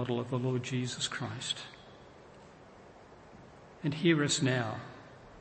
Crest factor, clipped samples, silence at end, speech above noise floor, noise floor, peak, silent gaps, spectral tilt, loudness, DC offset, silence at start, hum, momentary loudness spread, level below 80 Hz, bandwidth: 22 dB; under 0.1%; 0 s; 22 dB; -54 dBFS; -14 dBFS; none; -4.5 dB/octave; -32 LUFS; under 0.1%; 0 s; none; 26 LU; -68 dBFS; 8.8 kHz